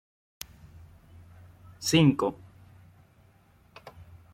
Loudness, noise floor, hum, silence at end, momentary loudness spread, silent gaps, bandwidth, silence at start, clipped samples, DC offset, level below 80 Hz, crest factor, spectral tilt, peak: -25 LUFS; -60 dBFS; none; 0.3 s; 29 LU; none; 16.5 kHz; 1.8 s; under 0.1%; under 0.1%; -60 dBFS; 22 dB; -5 dB/octave; -10 dBFS